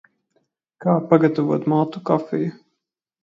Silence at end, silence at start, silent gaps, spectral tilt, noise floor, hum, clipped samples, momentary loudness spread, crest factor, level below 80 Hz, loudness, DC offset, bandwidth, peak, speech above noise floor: 0.7 s; 0.8 s; none; -10 dB/octave; -79 dBFS; none; under 0.1%; 9 LU; 20 dB; -68 dBFS; -20 LUFS; under 0.1%; 7.2 kHz; 0 dBFS; 60 dB